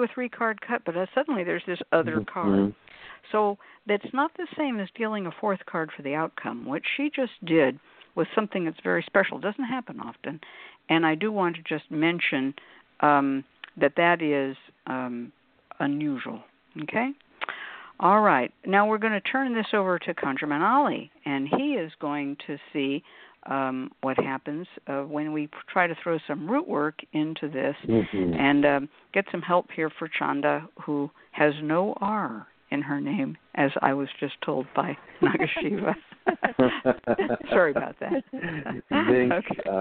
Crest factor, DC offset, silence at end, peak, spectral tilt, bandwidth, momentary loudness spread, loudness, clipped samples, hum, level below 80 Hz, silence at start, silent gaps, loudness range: 22 dB; under 0.1%; 0 s; -4 dBFS; -4 dB/octave; 4.5 kHz; 12 LU; -26 LUFS; under 0.1%; none; -64 dBFS; 0 s; none; 5 LU